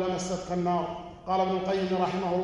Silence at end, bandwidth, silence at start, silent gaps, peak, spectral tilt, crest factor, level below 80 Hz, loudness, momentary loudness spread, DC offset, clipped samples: 0 s; 11 kHz; 0 s; none; -12 dBFS; -6 dB/octave; 16 dB; -56 dBFS; -29 LUFS; 5 LU; under 0.1%; under 0.1%